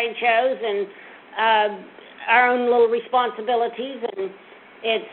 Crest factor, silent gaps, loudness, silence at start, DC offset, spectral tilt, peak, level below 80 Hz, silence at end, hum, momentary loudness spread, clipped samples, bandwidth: 18 dB; none; -21 LUFS; 0 s; under 0.1%; -7.5 dB/octave; -4 dBFS; -68 dBFS; 0 s; none; 15 LU; under 0.1%; 4.3 kHz